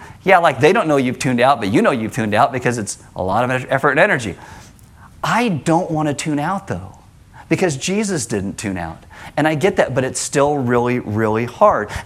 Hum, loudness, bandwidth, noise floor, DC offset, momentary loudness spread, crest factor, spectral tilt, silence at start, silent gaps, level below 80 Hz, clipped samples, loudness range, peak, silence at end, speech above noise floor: none; -17 LUFS; 15.5 kHz; -43 dBFS; under 0.1%; 11 LU; 18 dB; -5 dB/octave; 0 s; none; -48 dBFS; under 0.1%; 5 LU; 0 dBFS; 0 s; 26 dB